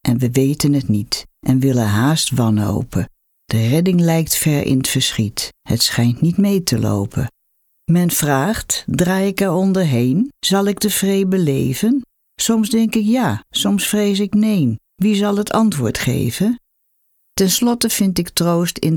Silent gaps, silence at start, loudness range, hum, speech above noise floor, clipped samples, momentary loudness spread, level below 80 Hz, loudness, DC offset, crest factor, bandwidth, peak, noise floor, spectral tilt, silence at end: none; 0.05 s; 2 LU; none; 49 dB; under 0.1%; 6 LU; -44 dBFS; -17 LUFS; under 0.1%; 14 dB; 19.5 kHz; -2 dBFS; -65 dBFS; -5 dB/octave; 0 s